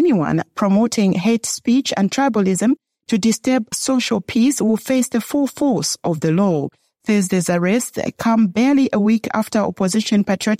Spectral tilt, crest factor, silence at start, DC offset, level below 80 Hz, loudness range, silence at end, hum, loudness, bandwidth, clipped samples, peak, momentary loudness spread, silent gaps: -5 dB/octave; 12 dB; 0 s; under 0.1%; -58 dBFS; 1 LU; 0.05 s; none; -18 LUFS; 15.5 kHz; under 0.1%; -6 dBFS; 5 LU; none